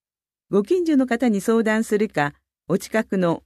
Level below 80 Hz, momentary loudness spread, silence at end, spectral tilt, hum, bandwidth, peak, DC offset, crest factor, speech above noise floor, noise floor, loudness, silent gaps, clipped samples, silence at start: -60 dBFS; 6 LU; 0.05 s; -6 dB/octave; none; 14.5 kHz; -6 dBFS; under 0.1%; 14 dB; 66 dB; -86 dBFS; -21 LUFS; none; under 0.1%; 0.5 s